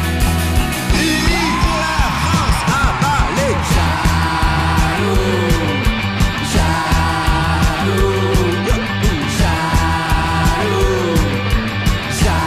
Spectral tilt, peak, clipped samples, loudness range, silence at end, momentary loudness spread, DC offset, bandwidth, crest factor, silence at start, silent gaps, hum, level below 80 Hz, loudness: -5 dB/octave; -4 dBFS; under 0.1%; 1 LU; 0 s; 2 LU; under 0.1%; 15.5 kHz; 10 dB; 0 s; none; none; -20 dBFS; -16 LUFS